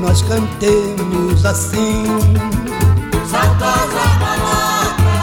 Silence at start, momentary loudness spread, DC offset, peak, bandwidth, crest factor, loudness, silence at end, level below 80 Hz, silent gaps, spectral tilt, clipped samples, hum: 0 s; 3 LU; under 0.1%; -2 dBFS; 18 kHz; 12 dB; -15 LUFS; 0 s; -26 dBFS; none; -5.5 dB/octave; under 0.1%; none